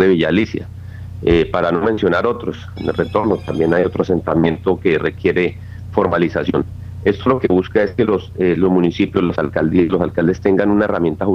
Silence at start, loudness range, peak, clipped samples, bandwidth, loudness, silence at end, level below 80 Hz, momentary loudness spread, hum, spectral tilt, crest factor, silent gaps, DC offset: 0 s; 2 LU; -2 dBFS; under 0.1%; 7 kHz; -17 LUFS; 0 s; -40 dBFS; 7 LU; none; -8 dB/octave; 16 dB; none; under 0.1%